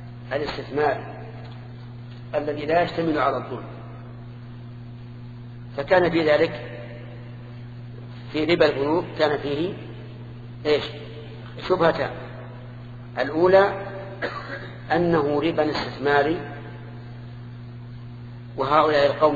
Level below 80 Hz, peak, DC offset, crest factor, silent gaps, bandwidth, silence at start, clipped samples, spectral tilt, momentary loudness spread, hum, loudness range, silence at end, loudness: -50 dBFS; -4 dBFS; under 0.1%; 22 dB; none; 7.6 kHz; 0 s; under 0.1%; -7.5 dB/octave; 20 LU; none; 4 LU; 0 s; -23 LUFS